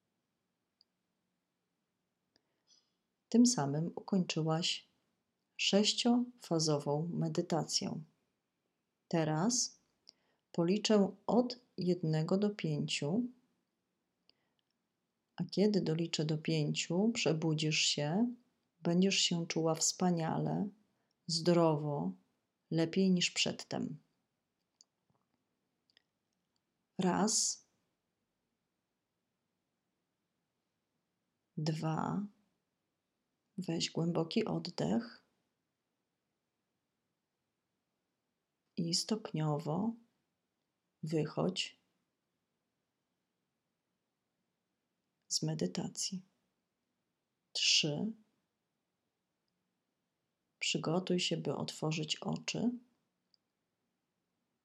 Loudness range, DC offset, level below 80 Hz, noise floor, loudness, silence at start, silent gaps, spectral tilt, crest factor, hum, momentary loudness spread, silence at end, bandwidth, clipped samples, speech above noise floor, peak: 10 LU; under 0.1%; -84 dBFS; -87 dBFS; -34 LUFS; 3.3 s; none; -4.5 dB/octave; 22 dB; none; 12 LU; 1.85 s; 13 kHz; under 0.1%; 53 dB; -16 dBFS